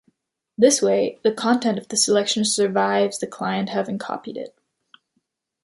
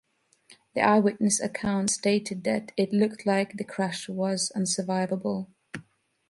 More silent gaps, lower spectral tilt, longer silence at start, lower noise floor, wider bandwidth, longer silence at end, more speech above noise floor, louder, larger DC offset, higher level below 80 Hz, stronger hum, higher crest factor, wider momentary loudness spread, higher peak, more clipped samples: neither; second, -3 dB/octave vs -4.5 dB/octave; about the same, 0.6 s vs 0.5 s; first, -73 dBFS vs -59 dBFS; about the same, 11.5 kHz vs 11.5 kHz; first, 1.15 s vs 0.5 s; first, 52 dB vs 33 dB; first, -21 LUFS vs -27 LUFS; neither; about the same, -68 dBFS vs -64 dBFS; neither; about the same, 20 dB vs 20 dB; about the same, 13 LU vs 12 LU; first, -2 dBFS vs -8 dBFS; neither